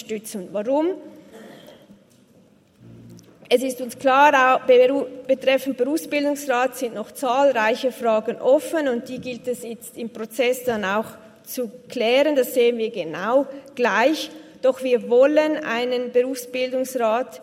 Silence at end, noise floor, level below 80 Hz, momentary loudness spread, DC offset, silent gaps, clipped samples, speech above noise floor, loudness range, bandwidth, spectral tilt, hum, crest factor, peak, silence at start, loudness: 0 s; -55 dBFS; -70 dBFS; 14 LU; under 0.1%; none; under 0.1%; 34 dB; 7 LU; 16.5 kHz; -3.5 dB/octave; none; 18 dB; -2 dBFS; 0 s; -21 LUFS